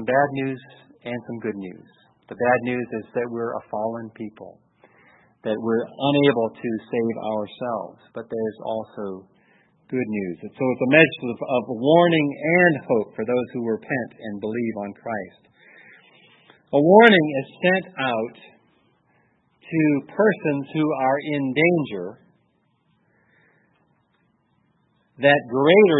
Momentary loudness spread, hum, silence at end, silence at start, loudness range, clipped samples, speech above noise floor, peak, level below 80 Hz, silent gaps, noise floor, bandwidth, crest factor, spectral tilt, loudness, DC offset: 17 LU; none; 0 s; 0 s; 10 LU; under 0.1%; 45 dB; 0 dBFS; -70 dBFS; none; -66 dBFS; 4.1 kHz; 22 dB; -9 dB/octave; -21 LUFS; under 0.1%